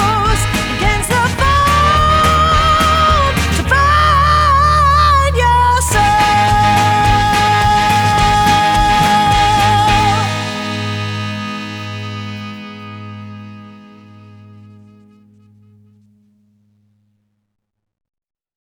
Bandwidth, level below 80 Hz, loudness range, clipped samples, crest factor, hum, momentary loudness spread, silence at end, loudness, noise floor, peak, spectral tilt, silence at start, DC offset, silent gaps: over 20 kHz; -24 dBFS; 15 LU; under 0.1%; 12 dB; none; 15 LU; 5 s; -12 LUFS; -64 dBFS; 0 dBFS; -4 dB/octave; 0 s; under 0.1%; none